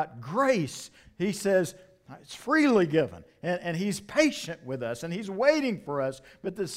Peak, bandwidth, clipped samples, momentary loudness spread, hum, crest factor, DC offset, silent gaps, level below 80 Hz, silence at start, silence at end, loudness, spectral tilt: -10 dBFS; 16 kHz; under 0.1%; 13 LU; none; 18 dB; under 0.1%; none; -64 dBFS; 0 s; 0 s; -28 LUFS; -5 dB/octave